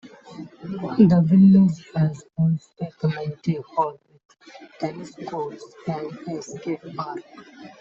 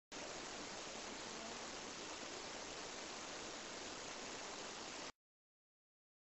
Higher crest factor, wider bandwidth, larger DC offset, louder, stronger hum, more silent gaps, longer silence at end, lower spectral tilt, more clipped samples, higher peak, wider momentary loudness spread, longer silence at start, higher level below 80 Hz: about the same, 18 dB vs 16 dB; about the same, 7.4 kHz vs 8 kHz; neither; first, -22 LUFS vs -48 LUFS; neither; first, 4.25-4.29 s vs none; second, 0.15 s vs 1.1 s; first, -9 dB/octave vs -1 dB/octave; neither; first, -4 dBFS vs -36 dBFS; first, 20 LU vs 0 LU; about the same, 0.05 s vs 0.1 s; first, -62 dBFS vs -74 dBFS